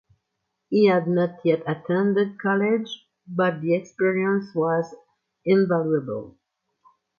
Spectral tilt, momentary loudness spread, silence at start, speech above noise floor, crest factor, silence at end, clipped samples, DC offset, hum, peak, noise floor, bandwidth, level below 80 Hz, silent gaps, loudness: -8 dB/octave; 13 LU; 0.7 s; 57 dB; 18 dB; 0.9 s; under 0.1%; under 0.1%; none; -6 dBFS; -79 dBFS; 7 kHz; -70 dBFS; none; -23 LUFS